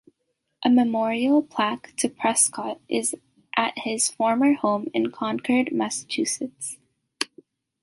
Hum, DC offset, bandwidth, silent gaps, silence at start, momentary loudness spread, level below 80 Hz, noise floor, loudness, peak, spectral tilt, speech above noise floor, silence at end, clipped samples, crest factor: none; under 0.1%; 11.5 kHz; none; 0.6 s; 11 LU; -70 dBFS; -76 dBFS; -24 LUFS; -4 dBFS; -2.5 dB/octave; 53 dB; 0.6 s; under 0.1%; 20 dB